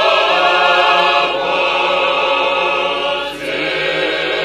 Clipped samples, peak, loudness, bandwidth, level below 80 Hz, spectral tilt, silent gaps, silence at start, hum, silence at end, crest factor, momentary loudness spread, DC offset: under 0.1%; 0 dBFS; -14 LUFS; 13.5 kHz; -50 dBFS; -2.5 dB/octave; none; 0 s; none; 0 s; 14 dB; 7 LU; under 0.1%